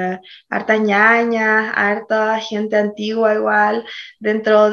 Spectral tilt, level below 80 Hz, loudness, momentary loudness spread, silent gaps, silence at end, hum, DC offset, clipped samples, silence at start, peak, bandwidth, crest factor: -5.5 dB/octave; -66 dBFS; -16 LUFS; 12 LU; none; 0 s; none; under 0.1%; under 0.1%; 0 s; 0 dBFS; 6.8 kHz; 16 dB